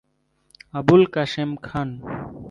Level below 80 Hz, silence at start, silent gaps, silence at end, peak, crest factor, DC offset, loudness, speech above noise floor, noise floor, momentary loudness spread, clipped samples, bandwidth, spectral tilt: -52 dBFS; 0.75 s; none; 0 s; -2 dBFS; 20 dB; under 0.1%; -21 LUFS; 45 dB; -65 dBFS; 17 LU; under 0.1%; 7.4 kHz; -7.5 dB/octave